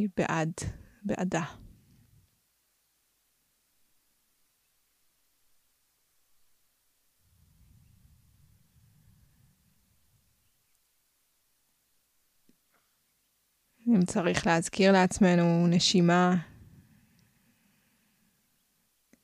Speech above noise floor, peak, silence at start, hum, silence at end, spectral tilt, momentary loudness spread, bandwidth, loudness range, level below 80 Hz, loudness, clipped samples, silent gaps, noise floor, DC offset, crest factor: 48 dB; -8 dBFS; 0 s; none; 2.8 s; -5.5 dB/octave; 15 LU; 12 kHz; 15 LU; -60 dBFS; -26 LUFS; under 0.1%; none; -74 dBFS; under 0.1%; 24 dB